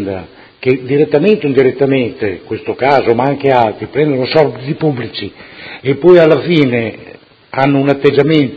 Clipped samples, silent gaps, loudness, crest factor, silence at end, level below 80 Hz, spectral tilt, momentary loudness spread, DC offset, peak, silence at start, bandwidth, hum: 0.4%; none; -12 LUFS; 12 dB; 0 s; -48 dBFS; -8.5 dB/octave; 13 LU; under 0.1%; 0 dBFS; 0 s; 6.6 kHz; none